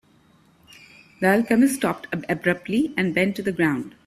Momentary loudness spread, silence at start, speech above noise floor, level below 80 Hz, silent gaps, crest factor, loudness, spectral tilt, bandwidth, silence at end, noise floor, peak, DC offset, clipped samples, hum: 7 LU; 1.2 s; 35 dB; -60 dBFS; none; 20 dB; -22 LUFS; -5.5 dB/octave; 15.5 kHz; 0.15 s; -57 dBFS; -4 dBFS; under 0.1%; under 0.1%; none